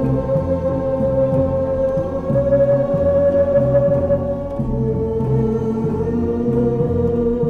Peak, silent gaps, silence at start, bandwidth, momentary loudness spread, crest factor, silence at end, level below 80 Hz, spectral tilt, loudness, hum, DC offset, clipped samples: -6 dBFS; none; 0 s; 6.4 kHz; 5 LU; 12 dB; 0 s; -34 dBFS; -11 dB/octave; -18 LUFS; none; 0.5%; under 0.1%